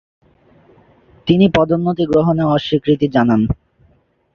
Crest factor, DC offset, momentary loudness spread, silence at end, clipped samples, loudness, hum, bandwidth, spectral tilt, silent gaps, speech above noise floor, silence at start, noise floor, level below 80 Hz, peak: 14 dB; under 0.1%; 6 LU; 0.8 s; under 0.1%; -15 LUFS; none; 7 kHz; -8.5 dB/octave; none; 42 dB; 1.25 s; -56 dBFS; -40 dBFS; -2 dBFS